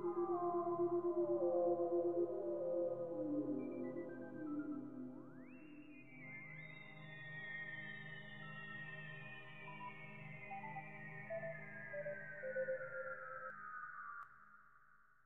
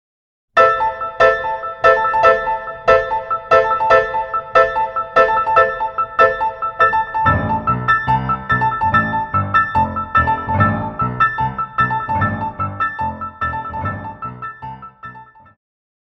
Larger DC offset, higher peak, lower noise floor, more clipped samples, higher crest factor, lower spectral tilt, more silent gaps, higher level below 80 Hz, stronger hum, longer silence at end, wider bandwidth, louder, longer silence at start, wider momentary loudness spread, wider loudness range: neither; second, -28 dBFS vs 0 dBFS; first, -70 dBFS vs -38 dBFS; neither; about the same, 18 dB vs 16 dB; second, -5.5 dB/octave vs -7 dB/octave; neither; second, -80 dBFS vs -40 dBFS; neither; second, 0 s vs 0.8 s; second, 4 kHz vs 7.6 kHz; second, -45 LUFS vs -16 LUFS; second, 0 s vs 0.55 s; first, 16 LU vs 11 LU; first, 11 LU vs 7 LU